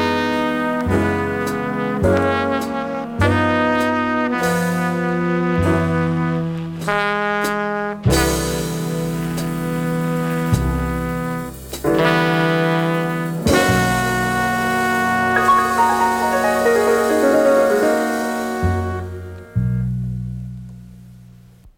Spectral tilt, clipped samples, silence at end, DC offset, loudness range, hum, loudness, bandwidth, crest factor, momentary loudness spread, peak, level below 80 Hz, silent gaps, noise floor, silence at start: -5.5 dB/octave; under 0.1%; 0.1 s; under 0.1%; 5 LU; none; -18 LUFS; 19 kHz; 16 dB; 9 LU; -2 dBFS; -36 dBFS; none; -44 dBFS; 0 s